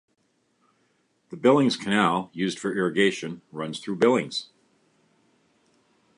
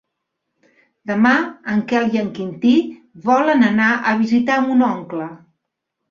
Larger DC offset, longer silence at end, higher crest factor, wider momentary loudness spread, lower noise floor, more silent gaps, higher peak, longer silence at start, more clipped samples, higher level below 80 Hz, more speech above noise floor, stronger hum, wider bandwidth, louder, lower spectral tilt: neither; first, 1.7 s vs 0.75 s; about the same, 20 dB vs 16 dB; about the same, 13 LU vs 12 LU; second, -69 dBFS vs -78 dBFS; neither; second, -6 dBFS vs -2 dBFS; first, 1.3 s vs 1.05 s; neither; second, -70 dBFS vs -62 dBFS; second, 45 dB vs 61 dB; neither; first, 11.5 kHz vs 7.2 kHz; second, -24 LUFS vs -17 LUFS; about the same, -5 dB/octave vs -6 dB/octave